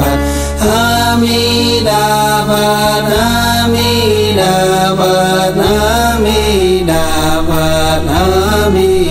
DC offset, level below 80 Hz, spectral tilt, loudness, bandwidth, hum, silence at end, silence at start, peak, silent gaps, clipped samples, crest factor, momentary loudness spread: under 0.1%; -22 dBFS; -4.5 dB/octave; -11 LUFS; 16.5 kHz; none; 0 s; 0 s; 0 dBFS; none; under 0.1%; 10 dB; 2 LU